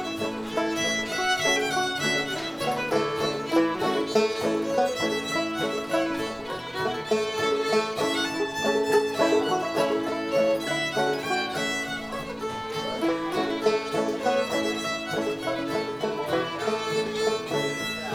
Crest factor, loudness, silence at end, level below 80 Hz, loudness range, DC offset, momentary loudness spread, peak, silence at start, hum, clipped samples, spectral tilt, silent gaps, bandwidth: 18 dB; -26 LUFS; 0 s; -60 dBFS; 3 LU; under 0.1%; 6 LU; -10 dBFS; 0 s; none; under 0.1%; -3.5 dB/octave; none; over 20 kHz